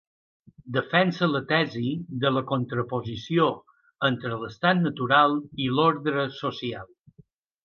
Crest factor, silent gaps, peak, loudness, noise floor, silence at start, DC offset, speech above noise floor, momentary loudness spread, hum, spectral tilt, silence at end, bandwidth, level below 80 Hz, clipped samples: 20 dB; none; -6 dBFS; -25 LUFS; -58 dBFS; 0.65 s; under 0.1%; 33 dB; 9 LU; none; -7 dB/octave; 0.8 s; 6.8 kHz; -62 dBFS; under 0.1%